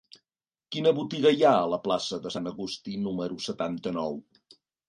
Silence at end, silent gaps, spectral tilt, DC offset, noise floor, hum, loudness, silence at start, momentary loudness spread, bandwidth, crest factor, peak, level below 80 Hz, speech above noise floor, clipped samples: 0.65 s; none; -5.5 dB/octave; under 0.1%; under -90 dBFS; none; -27 LUFS; 0.7 s; 13 LU; 11.5 kHz; 20 dB; -8 dBFS; -66 dBFS; over 63 dB; under 0.1%